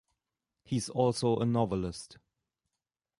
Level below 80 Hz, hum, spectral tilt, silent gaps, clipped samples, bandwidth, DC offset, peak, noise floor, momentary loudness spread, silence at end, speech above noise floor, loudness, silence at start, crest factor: -58 dBFS; none; -6.5 dB/octave; none; under 0.1%; 11.5 kHz; under 0.1%; -14 dBFS; -90 dBFS; 13 LU; 1.05 s; 59 dB; -31 LUFS; 0.7 s; 20 dB